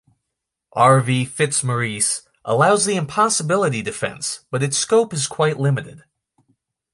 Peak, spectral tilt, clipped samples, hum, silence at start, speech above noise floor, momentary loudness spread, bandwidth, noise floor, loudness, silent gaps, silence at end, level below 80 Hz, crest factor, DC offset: -2 dBFS; -4 dB/octave; under 0.1%; none; 0.75 s; 62 dB; 10 LU; 11.5 kHz; -81 dBFS; -19 LUFS; none; 0.95 s; -60 dBFS; 18 dB; under 0.1%